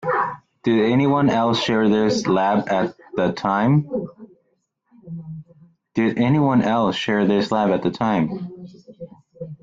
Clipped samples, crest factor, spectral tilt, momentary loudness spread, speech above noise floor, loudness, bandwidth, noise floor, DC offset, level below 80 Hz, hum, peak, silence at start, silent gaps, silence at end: under 0.1%; 14 dB; -6.5 dB/octave; 20 LU; 50 dB; -20 LUFS; 7.8 kHz; -69 dBFS; under 0.1%; -56 dBFS; none; -6 dBFS; 0 s; none; 0.1 s